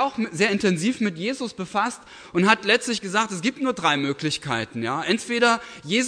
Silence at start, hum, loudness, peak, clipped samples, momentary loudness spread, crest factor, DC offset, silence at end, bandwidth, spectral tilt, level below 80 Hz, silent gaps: 0 s; none; -23 LUFS; -2 dBFS; under 0.1%; 8 LU; 20 dB; under 0.1%; 0 s; 11 kHz; -4 dB/octave; -62 dBFS; none